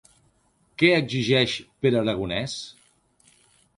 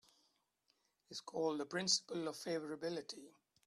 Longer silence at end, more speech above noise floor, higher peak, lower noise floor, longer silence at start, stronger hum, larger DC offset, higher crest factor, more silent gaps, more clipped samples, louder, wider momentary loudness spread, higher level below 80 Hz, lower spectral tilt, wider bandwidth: first, 1.05 s vs 0.35 s; about the same, 42 dB vs 40 dB; first, -4 dBFS vs -20 dBFS; second, -65 dBFS vs -81 dBFS; second, 0.8 s vs 1.1 s; neither; neither; about the same, 22 dB vs 24 dB; neither; neither; first, -23 LUFS vs -40 LUFS; about the same, 15 LU vs 16 LU; first, -56 dBFS vs -88 dBFS; first, -5 dB/octave vs -2.5 dB/octave; second, 11.5 kHz vs 14 kHz